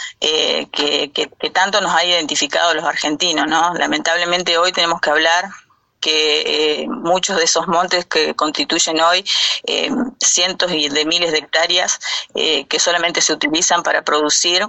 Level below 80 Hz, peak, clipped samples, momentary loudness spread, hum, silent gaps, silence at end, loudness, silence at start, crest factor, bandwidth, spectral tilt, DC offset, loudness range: -58 dBFS; -2 dBFS; under 0.1%; 4 LU; none; none; 0 s; -15 LUFS; 0 s; 16 dB; 8.6 kHz; -0.5 dB/octave; under 0.1%; 1 LU